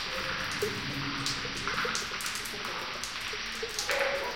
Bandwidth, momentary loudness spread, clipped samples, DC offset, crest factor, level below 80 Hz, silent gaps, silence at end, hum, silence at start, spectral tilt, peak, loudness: 17 kHz; 5 LU; under 0.1%; 0.2%; 22 dB; -54 dBFS; none; 0 s; none; 0 s; -2 dB/octave; -12 dBFS; -32 LUFS